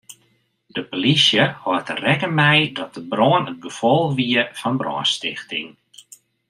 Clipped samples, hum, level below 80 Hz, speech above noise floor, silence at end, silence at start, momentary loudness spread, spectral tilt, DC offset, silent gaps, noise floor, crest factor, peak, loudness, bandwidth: under 0.1%; none; -62 dBFS; 44 dB; 0.8 s; 0.1 s; 14 LU; -4.5 dB/octave; under 0.1%; none; -63 dBFS; 20 dB; -2 dBFS; -19 LUFS; 13 kHz